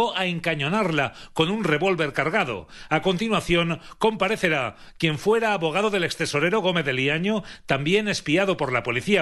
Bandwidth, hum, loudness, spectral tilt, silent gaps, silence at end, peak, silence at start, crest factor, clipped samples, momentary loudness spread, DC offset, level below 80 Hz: 13 kHz; none; -23 LUFS; -5 dB/octave; none; 0 s; -6 dBFS; 0 s; 18 dB; under 0.1%; 5 LU; under 0.1%; -50 dBFS